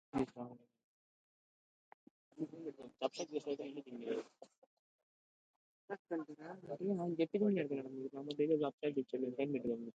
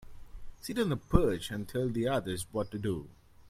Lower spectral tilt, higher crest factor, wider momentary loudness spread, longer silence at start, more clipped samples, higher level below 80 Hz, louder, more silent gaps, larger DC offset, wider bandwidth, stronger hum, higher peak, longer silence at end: about the same, -6.5 dB/octave vs -6 dB/octave; about the same, 20 dB vs 24 dB; first, 15 LU vs 9 LU; first, 0.15 s vs 0 s; neither; second, -78 dBFS vs -42 dBFS; second, -41 LUFS vs -33 LUFS; first, 0.84-2.31 s, 4.58-5.88 s, 5.99-6.05 s, 8.73-8.78 s vs none; neither; second, 8.8 kHz vs 16 kHz; neither; second, -22 dBFS vs -8 dBFS; about the same, 0.1 s vs 0 s